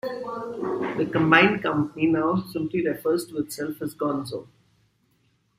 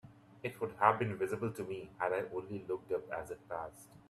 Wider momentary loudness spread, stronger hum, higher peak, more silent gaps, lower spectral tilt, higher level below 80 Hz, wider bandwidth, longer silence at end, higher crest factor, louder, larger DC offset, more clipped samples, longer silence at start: about the same, 14 LU vs 13 LU; neither; first, -4 dBFS vs -12 dBFS; neither; about the same, -6 dB/octave vs -6.5 dB/octave; first, -62 dBFS vs -70 dBFS; first, 15.5 kHz vs 13.5 kHz; first, 1.15 s vs 0.1 s; about the same, 22 dB vs 26 dB; first, -24 LUFS vs -37 LUFS; neither; neither; about the same, 0.05 s vs 0.05 s